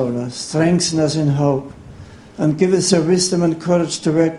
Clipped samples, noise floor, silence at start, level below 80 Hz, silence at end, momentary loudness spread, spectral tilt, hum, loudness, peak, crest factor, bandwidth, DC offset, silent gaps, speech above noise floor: under 0.1%; -38 dBFS; 0 s; -48 dBFS; 0 s; 8 LU; -5 dB/octave; none; -17 LUFS; 0 dBFS; 16 dB; 11.5 kHz; under 0.1%; none; 22 dB